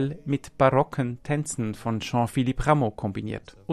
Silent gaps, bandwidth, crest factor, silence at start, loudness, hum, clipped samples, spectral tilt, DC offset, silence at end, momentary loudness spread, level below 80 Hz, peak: none; 13.5 kHz; 20 dB; 0 s; -26 LUFS; none; under 0.1%; -6.5 dB/octave; under 0.1%; 0 s; 10 LU; -44 dBFS; -6 dBFS